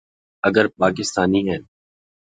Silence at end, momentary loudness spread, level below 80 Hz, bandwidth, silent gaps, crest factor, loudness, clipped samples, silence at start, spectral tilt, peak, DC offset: 0.75 s; 7 LU; -50 dBFS; 9.4 kHz; none; 20 dB; -20 LUFS; under 0.1%; 0.45 s; -5 dB/octave; 0 dBFS; under 0.1%